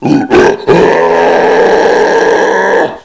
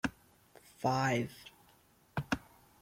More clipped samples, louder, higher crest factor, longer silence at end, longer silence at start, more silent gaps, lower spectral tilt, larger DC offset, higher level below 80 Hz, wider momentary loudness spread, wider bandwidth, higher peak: first, 0.8% vs under 0.1%; first, -7 LUFS vs -36 LUFS; second, 8 dB vs 22 dB; second, 0.05 s vs 0.45 s; about the same, 0 s vs 0.05 s; neither; about the same, -5.5 dB/octave vs -5.5 dB/octave; neither; first, -38 dBFS vs -62 dBFS; second, 2 LU vs 16 LU; second, 8 kHz vs 16.5 kHz; first, 0 dBFS vs -16 dBFS